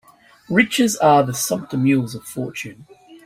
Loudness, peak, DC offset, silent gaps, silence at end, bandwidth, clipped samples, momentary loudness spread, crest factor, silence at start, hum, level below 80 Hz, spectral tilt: -18 LUFS; -2 dBFS; under 0.1%; none; 0.1 s; 16 kHz; under 0.1%; 14 LU; 18 dB; 0.5 s; none; -58 dBFS; -4.5 dB/octave